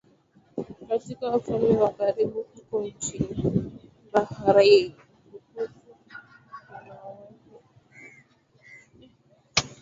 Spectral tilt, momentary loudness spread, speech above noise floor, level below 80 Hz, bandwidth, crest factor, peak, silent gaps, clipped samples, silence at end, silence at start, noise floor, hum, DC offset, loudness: -4.5 dB/octave; 26 LU; 37 dB; -54 dBFS; 7.8 kHz; 24 dB; -4 dBFS; none; under 0.1%; 0.15 s; 0.55 s; -60 dBFS; none; under 0.1%; -25 LUFS